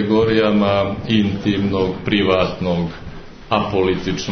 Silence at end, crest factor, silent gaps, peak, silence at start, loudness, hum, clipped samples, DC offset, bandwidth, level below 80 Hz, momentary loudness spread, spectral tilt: 0 s; 16 dB; none; -2 dBFS; 0 s; -18 LUFS; none; under 0.1%; under 0.1%; 6.6 kHz; -40 dBFS; 7 LU; -6.5 dB/octave